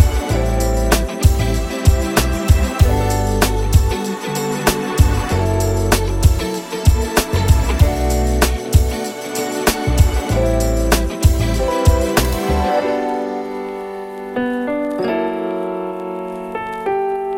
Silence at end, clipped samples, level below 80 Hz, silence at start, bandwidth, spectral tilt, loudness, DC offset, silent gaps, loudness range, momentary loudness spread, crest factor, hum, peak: 0 s; under 0.1%; -20 dBFS; 0 s; 17 kHz; -5.5 dB/octave; -18 LUFS; under 0.1%; none; 5 LU; 8 LU; 16 dB; none; 0 dBFS